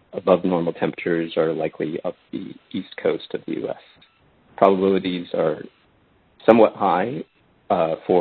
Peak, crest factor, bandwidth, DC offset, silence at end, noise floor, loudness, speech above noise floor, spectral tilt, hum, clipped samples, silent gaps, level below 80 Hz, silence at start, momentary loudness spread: 0 dBFS; 22 dB; 4.6 kHz; under 0.1%; 0 s; -59 dBFS; -21 LUFS; 38 dB; -9.5 dB/octave; none; under 0.1%; none; -60 dBFS; 0.15 s; 16 LU